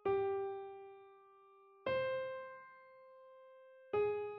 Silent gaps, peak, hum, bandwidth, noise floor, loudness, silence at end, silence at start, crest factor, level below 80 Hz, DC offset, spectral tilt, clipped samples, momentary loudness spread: none; -26 dBFS; none; 5.2 kHz; -64 dBFS; -40 LUFS; 0 s; 0.05 s; 16 dB; -76 dBFS; under 0.1%; -3.5 dB/octave; under 0.1%; 23 LU